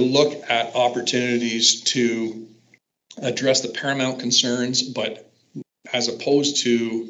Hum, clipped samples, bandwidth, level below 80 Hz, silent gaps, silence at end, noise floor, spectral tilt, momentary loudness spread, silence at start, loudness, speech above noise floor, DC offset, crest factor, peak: none; under 0.1%; 8.4 kHz; -78 dBFS; none; 0 s; -60 dBFS; -2.5 dB/octave; 13 LU; 0 s; -21 LUFS; 39 dB; under 0.1%; 20 dB; -2 dBFS